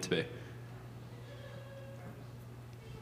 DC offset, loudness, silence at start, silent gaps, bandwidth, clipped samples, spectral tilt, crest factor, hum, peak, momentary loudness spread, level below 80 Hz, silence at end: under 0.1%; -45 LUFS; 0 s; none; 15.5 kHz; under 0.1%; -5 dB/octave; 26 dB; 60 Hz at -50 dBFS; -18 dBFS; 12 LU; -64 dBFS; 0 s